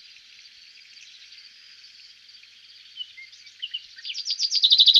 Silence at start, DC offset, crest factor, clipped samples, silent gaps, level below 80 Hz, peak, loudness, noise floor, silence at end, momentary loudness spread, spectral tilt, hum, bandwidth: 2.95 s; under 0.1%; 22 dB; under 0.1%; none; -82 dBFS; -4 dBFS; -22 LUFS; -50 dBFS; 0 s; 26 LU; 5.5 dB/octave; none; 14 kHz